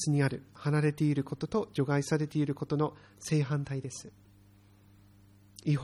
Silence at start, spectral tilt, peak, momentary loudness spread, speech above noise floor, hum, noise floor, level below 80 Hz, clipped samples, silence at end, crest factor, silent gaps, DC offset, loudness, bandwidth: 0 s; -6.5 dB/octave; -16 dBFS; 9 LU; 29 dB; none; -60 dBFS; -64 dBFS; under 0.1%; 0 s; 16 dB; none; under 0.1%; -32 LUFS; 12.5 kHz